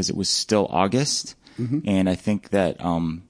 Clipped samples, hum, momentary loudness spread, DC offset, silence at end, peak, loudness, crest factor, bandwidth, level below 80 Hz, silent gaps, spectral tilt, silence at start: under 0.1%; none; 6 LU; under 0.1%; 0.05 s; -6 dBFS; -23 LUFS; 18 dB; 10.5 kHz; -52 dBFS; none; -4.5 dB/octave; 0 s